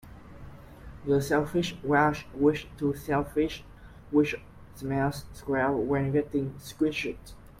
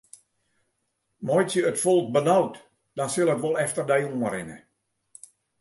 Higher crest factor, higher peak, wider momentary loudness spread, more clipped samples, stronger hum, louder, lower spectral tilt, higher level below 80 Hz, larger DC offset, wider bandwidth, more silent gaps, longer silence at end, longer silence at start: about the same, 18 dB vs 18 dB; about the same, -10 dBFS vs -8 dBFS; first, 17 LU vs 12 LU; neither; neither; second, -28 LUFS vs -24 LUFS; first, -6.5 dB/octave vs -5 dB/octave; first, -50 dBFS vs -68 dBFS; neither; first, 16 kHz vs 12 kHz; neither; second, 0.15 s vs 1 s; second, 0.05 s vs 1.2 s